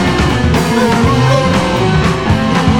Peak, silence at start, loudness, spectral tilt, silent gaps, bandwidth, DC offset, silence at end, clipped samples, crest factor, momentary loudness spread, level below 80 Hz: 0 dBFS; 0 s; -12 LUFS; -6 dB/octave; none; 18 kHz; under 0.1%; 0 s; under 0.1%; 10 dB; 2 LU; -24 dBFS